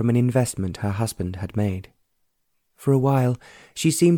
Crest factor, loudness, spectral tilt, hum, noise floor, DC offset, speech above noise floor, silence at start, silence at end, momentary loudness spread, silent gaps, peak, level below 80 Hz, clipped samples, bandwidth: 16 dB; -23 LUFS; -6.5 dB/octave; none; -72 dBFS; under 0.1%; 50 dB; 0 s; 0 s; 11 LU; none; -6 dBFS; -52 dBFS; under 0.1%; 18 kHz